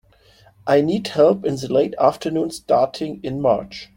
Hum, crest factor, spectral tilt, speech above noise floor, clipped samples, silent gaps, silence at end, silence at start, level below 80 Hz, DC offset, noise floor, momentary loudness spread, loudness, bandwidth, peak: none; 18 dB; -6 dB/octave; 33 dB; under 0.1%; none; 0.1 s; 0.65 s; -54 dBFS; under 0.1%; -52 dBFS; 8 LU; -19 LUFS; 16.5 kHz; -2 dBFS